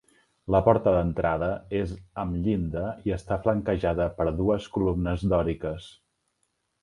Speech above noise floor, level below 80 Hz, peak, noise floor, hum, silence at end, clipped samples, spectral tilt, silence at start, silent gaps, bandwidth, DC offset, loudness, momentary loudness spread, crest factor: 50 dB; -40 dBFS; -6 dBFS; -75 dBFS; none; 0.9 s; under 0.1%; -8.5 dB/octave; 0.45 s; none; 11 kHz; under 0.1%; -26 LUFS; 10 LU; 22 dB